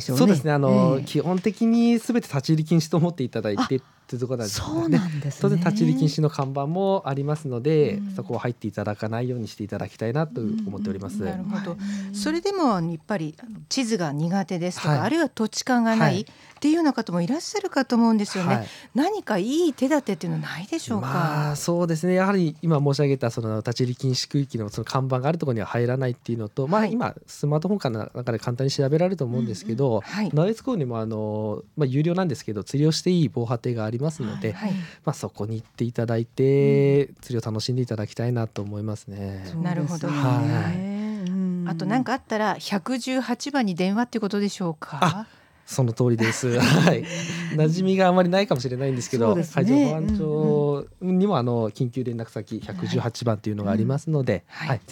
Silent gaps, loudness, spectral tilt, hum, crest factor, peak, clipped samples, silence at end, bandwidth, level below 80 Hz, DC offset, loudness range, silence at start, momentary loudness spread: none; -24 LUFS; -6.5 dB/octave; none; 22 dB; -2 dBFS; under 0.1%; 0 s; 17.5 kHz; -56 dBFS; under 0.1%; 5 LU; 0 s; 10 LU